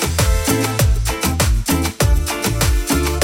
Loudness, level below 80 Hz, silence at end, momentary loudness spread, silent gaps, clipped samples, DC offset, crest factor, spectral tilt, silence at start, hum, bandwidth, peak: -17 LUFS; -20 dBFS; 0 s; 2 LU; none; under 0.1%; under 0.1%; 12 dB; -4 dB/octave; 0 s; none; 17 kHz; -4 dBFS